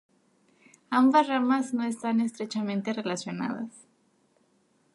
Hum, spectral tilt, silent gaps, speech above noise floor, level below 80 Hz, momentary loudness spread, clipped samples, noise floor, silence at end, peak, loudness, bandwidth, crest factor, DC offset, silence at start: none; -5 dB/octave; none; 41 dB; -80 dBFS; 12 LU; under 0.1%; -68 dBFS; 1.2 s; -10 dBFS; -27 LUFS; 11.5 kHz; 18 dB; under 0.1%; 0.9 s